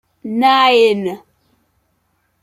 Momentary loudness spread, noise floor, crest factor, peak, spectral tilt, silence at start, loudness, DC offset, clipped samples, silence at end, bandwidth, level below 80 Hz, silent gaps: 15 LU; -64 dBFS; 16 dB; -2 dBFS; -4.5 dB/octave; 0.25 s; -13 LUFS; under 0.1%; under 0.1%; 1.25 s; 15 kHz; -66 dBFS; none